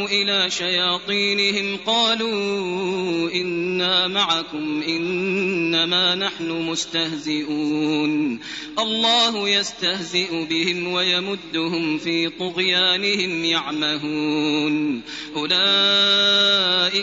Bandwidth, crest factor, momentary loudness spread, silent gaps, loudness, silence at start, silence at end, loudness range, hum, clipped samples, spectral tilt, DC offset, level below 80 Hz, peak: 8 kHz; 16 dB; 9 LU; none; -19 LUFS; 0 s; 0 s; 3 LU; none; under 0.1%; -1 dB/octave; under 0.1%; -60 dBFS; -6 dBFS